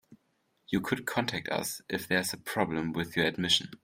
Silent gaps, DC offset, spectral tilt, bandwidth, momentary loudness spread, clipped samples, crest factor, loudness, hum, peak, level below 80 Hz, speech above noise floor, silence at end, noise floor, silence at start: none; under 0.1%; -3.5 dB/octave; 16 kHz; 7 LU; under 0.1%; 22 dB; -31 LUFS; none; -10 dBFS; -64 dBFS; 43 dB; 0.1 s; -74 dBFS; 0.1 s